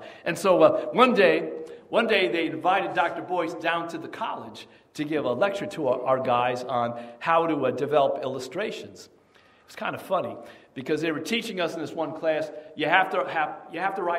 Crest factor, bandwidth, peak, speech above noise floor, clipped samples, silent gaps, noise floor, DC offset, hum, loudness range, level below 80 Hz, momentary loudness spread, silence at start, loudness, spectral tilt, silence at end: 22 dB; 16 kHz; -4 dBFS; 32 dB; under 0.1%; none; -58 dBFS; under 0.1%; none; 8 LU; -72 dBFS; 14 LU; 0 s; -25 LUFS; -5 dB/octave; 0 s